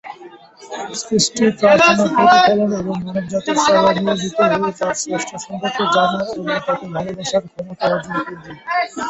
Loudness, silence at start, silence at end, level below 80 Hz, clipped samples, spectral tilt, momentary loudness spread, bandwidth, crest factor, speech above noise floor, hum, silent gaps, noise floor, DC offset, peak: -17 LUFS; 0.05 s; 0 s; -54 dBFS; under 0.1%; -4 dB/octave; 14 LU; 8.2 kHz; 16 dB; 24 dB; none; none; -40 dBFS; under 0.1%; 0 dBFS